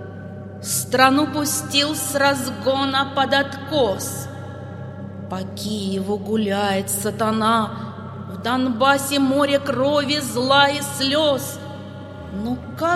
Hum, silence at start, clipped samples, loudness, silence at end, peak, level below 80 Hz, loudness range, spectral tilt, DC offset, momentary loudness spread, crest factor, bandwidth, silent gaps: none; 0 s; under 0.1%; -20 LUFS; 0 s; 0 dBFS; -54 dBFS; 6 LU; -3.5 dB/octave; under 0.1%; 18 LU; 20 dB; 16 kHz; none